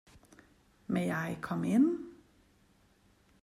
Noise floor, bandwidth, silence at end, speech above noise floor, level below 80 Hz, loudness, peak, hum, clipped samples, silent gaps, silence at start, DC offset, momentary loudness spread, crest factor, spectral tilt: -67 dBFS; 14.5 kHz; 1.3 s; 36 dB; -68 dBFS; -32 LUFS; -18 dBFS; none; under 0.1%; none; 0.9 s; under 0.1%; 18 LU; 18 dB; -7.5 dB/octave